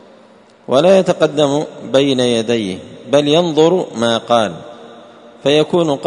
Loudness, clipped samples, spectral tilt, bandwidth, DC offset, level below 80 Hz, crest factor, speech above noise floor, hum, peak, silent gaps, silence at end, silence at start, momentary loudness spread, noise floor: -14 LUFS; under 0.1%; -5 dB/octave; 10.5 kHz; under 0.1%; -58 dBFS; 14 dB; 31 dB; none; 0 dBFS; none; 0 s; 0.7 s; 10 LU; -45 dBFS